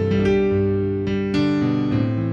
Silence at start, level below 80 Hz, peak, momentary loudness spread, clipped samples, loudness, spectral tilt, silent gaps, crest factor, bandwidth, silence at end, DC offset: 0 s; -42 dBFS; -8 dBFS; 4 LU; under 0.1%; -20 LUFS; -8.5 dB/octave; none; 12 dB; 7.8 kHz; 0 s; under 0.1%